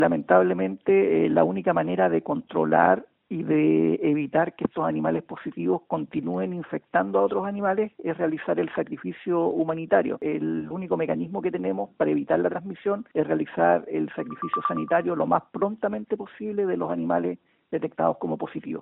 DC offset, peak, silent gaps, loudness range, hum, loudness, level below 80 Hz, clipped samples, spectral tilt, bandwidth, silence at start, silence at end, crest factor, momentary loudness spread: under 0.1%; -4 dBFS; none; 4 LU; none; -25 LUFS; -64 dBFS; under 0.1%; -6.5 dB/octave; 4 kHz; 0 s; 0 s; 20 dB; 10 LU